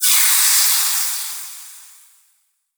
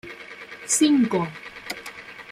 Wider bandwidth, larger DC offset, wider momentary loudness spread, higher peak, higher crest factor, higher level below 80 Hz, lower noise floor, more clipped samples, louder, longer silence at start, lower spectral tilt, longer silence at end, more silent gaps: first, over 20 kHz vs 15.5 kHz; neither; about the same, 19 LU vs 20 LU; first, 0 dBFS vs -8 dBFS; about the same, 18 dB vs 16 dB; second, under -90 dBFS vs -64 dBFS; first, -63 dBFS vs -41 dBFS; neither; first, -13 LUFS vs -22 LUFS; about the same, 0 s vs 0.05 s; second, 11.5 dB/octave vs -3.5 dB/octave; first, 0.95 s vs 0.1 s; neither